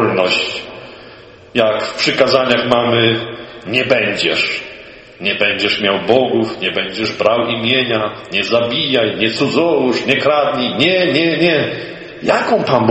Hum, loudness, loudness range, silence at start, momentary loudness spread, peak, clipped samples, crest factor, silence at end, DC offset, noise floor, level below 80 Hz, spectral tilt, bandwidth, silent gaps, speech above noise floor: none; -14 LUFS; 2 LU; 0 s; 9 LU; 0 dBFS; under 0.1%; 16 dB; 0 s; under 0.1%; -38 dBFS; -52 dBFS; -5 dB/octave; 8.6 kHz; none; 24 dB